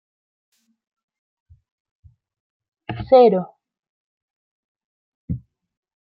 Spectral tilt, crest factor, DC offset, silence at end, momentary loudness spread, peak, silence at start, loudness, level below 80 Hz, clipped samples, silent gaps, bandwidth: -10 dB/octave; 22 dB; under 0.1%; 0.65 s; 23 LU; -2 dBFS; 2.9 s; -15 LUFS; -52 dBFS; under 0.1%; 3.79-3.83 s, 3.89-4.75 s, 4.84-5.28 s; 5 kHz